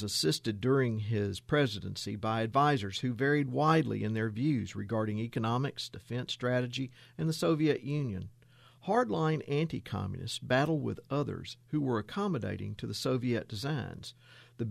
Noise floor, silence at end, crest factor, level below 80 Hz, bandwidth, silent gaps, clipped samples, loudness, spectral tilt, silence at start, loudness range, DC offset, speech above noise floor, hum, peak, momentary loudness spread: -59 dBFS; 0 s; 18 dB; -64 dBFS; 14.5 kHz; none; under 0.1%; -32 LUFS; -6 dB/octave; 0 s; 4 LU; under 0.1%; 27 dB; none; -14 dBFS; 10 LU